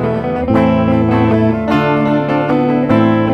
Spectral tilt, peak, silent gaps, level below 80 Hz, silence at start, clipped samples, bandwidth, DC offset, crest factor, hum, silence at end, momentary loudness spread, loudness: -9 dB/octave; 0 dBFS; none; -36 dBFS; 0 s; under 0.1%; 6.4 kHz; 0.2%; 12 dB; none; 0 s; 3 LU; -13 LUFS